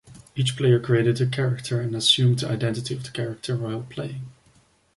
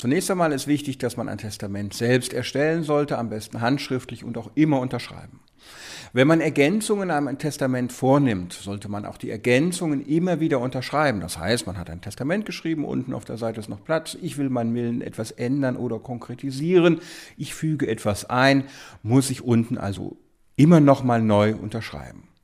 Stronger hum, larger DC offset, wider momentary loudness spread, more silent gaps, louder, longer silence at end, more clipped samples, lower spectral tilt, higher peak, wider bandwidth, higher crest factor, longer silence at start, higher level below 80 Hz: neither; neither; about the same, 14 LU vs 15 LU; neither; about the same, -23 LUFS vs -23 LUFS; first, 0.65 s vs 0.3 s; neither; about the same, -5.5 dB/octave vs -6 dB/octave; second, -6 dBFS vs -2 dBFS; second, 11.5 kHz vs 15.5 kHz; about the same, 18 dB vs 20 dB; about the same, 0.05 s vs 0 s; about the same, -58 dBFS vs -54 dBFS